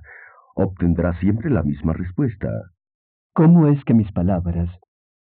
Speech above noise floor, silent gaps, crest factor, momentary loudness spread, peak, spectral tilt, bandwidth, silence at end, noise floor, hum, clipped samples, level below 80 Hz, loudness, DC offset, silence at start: 27 dB; 2.94-3.30 s; 16 dB; 14 LU; -4 dBFS; -11 dB/octave; 3.8 kHz; 0.5 s; -45 dBFS; none; under 0.1%; -38 dBFS; -19 LUFS; under 0.1%; 0.55 s